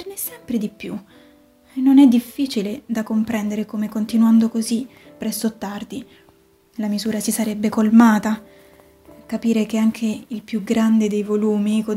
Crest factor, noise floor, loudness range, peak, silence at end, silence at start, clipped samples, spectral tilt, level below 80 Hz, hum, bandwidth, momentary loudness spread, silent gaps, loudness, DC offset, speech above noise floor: 18 dB; -54 dBFS; 4 LU; -2 dBFS; 0 s; 0 s; under 0.1%; -5.5 dB/octave; -58 dBFS; none; 16 kHz; 17 LU; none; -19 LUFS; under 0.1%; 36 dB